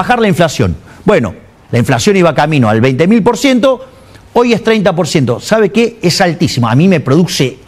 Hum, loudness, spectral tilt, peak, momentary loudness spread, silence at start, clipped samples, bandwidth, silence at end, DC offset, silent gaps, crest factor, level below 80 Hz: none; -10 LUFS; -5.5 dB/octave; 0 dBFS; 6 LU; 0 s; 0.4%; 15.5 kHz; 0.15 s; under 0.1%; none; 10 dB; -40 dBFS